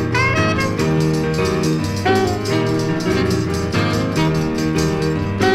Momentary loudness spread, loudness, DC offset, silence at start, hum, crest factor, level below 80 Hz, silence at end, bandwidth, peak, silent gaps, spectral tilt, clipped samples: 3 LU; -18 LUFS; under 0.1%; 0 s; none; 14 dB; -36 dBFS; 0 s; 16 kHz; -4 dBFS; none; -6 dB/octave; under 0.1%